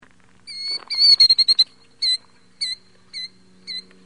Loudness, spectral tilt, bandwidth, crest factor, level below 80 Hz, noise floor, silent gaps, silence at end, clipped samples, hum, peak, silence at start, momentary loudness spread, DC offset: -15 LUFS; 2 dB/octave; 11.5 kHz; 16 dB; -64 dBFS; -47 dBFS; none; 0.25 s; under 0.1%; none; -4 dBFS; 0.45 s; 22 LU; 0.2%